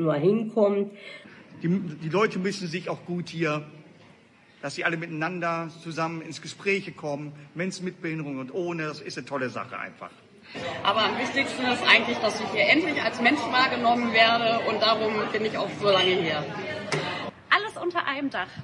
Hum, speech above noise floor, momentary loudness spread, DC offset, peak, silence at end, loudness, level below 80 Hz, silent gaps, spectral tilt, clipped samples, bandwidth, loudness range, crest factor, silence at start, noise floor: none; 30 dB; 14 LU; under 0.1%; -6 dBFS; 0 s; -25 LUFS; -72 dBFS; none; -4.5 dB/octave; under 0.1%; 11.5 kHz; 9 LU; 22 dB; 0 s; -56 dBFS